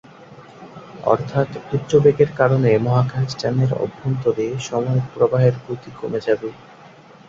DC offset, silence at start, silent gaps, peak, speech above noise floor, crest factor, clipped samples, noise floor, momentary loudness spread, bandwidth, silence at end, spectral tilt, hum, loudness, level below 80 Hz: under 0.1%; 0.2 s; none; 0 dBFS; 26 dB; 18 dB; under 0.1%; -44 dBFS; 14 LU; 7.6 kHz; 0.7 s; -7.5 dB/octave; none; -19 LUFS; -54 dBFS